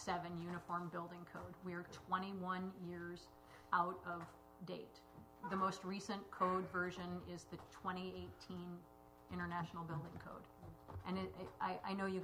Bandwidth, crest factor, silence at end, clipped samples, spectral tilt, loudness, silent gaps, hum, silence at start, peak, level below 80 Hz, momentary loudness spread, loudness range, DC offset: 16 kHz; 24 dB; 0 s; under 0.1%; -6 dB/octave; -46 LUFS; none; none; 0 s; -22 dBFS; -70 dBFS; 16 LU; 5 LU; under 0.1%